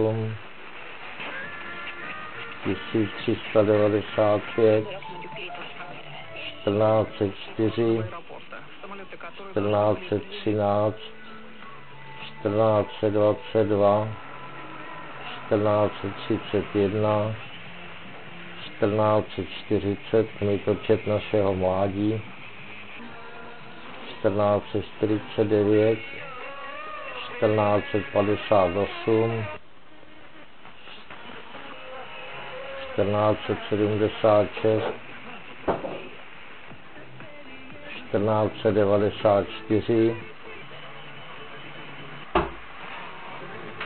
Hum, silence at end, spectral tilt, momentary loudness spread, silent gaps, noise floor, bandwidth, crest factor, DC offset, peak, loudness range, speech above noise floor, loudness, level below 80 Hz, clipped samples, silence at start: none; 0 s; -11 dB/octave; 19 LU; none; -52 dBFS; 4.5 kHz; 20 dB; 0.9%; -6 dBFS; 6 LU; 28 dB; -25 LUFS; -56 dBFS; under 0.1%; 0 s